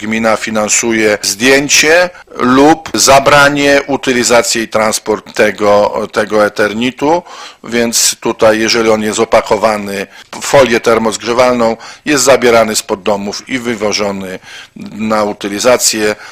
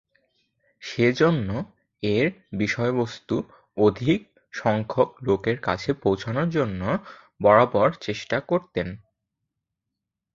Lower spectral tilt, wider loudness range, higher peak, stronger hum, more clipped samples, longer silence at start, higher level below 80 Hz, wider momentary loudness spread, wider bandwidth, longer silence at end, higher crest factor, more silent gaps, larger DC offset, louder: second, -2.5 dB/octave vs -7 dB/octave; first, 5 LU vs 2 LU; about the same, 0 dBFS vs -2 dBFS; neither; first, 0.4% vs under 0.1%; second, 0 s vs 0.8 s; first, -42 dBFS vs -52 dBFS; about the same, 11 LU vs 12 LU; first, 16.5 kHz vs 7.6 kHz; second, 0 s vs 1.4 s; second, 10 dB vs 22 dB; neither; neither; first, -10 LUFS vs -24 LUFS